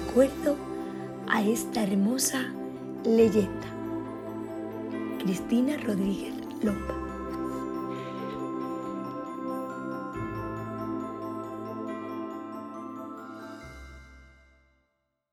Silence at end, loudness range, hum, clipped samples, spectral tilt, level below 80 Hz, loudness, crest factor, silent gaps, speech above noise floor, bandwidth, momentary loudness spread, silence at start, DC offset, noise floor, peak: 1 s; 11 LU; none; under 0.1%; -5 dB/octave; -52 dBFS; -31 LUFS; 20 dB; none; 51 dB; 16 kHz; 14 LU; 0 s; under 0.1%; -77 dBFS; -10 dBFS